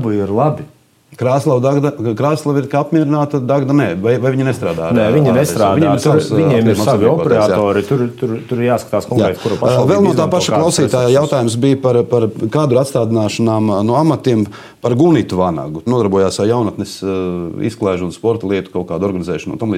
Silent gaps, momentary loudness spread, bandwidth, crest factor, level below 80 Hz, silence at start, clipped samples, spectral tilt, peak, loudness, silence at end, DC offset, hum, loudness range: none; 7 LU; 16 kHz; 12 dB; -50 dBFS; 0 s; under 0.1%; -6.5 dB/octave; 0 dBFS; -14 LUFS; 0 s; under 0.1%; none; 3 LU